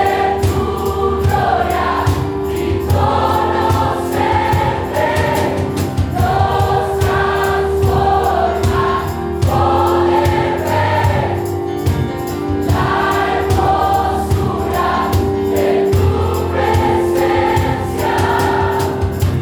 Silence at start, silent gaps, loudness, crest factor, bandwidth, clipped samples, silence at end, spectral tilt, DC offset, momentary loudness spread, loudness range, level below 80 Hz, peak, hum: 0 s; none; -15 LUFS; 14 dB; over 20 kHz; under 0.1%; 0 s; -6.5 dB/octave; under 0.1%; 4 LU; 1 LU; -28 dBFS; -2 dBFS; none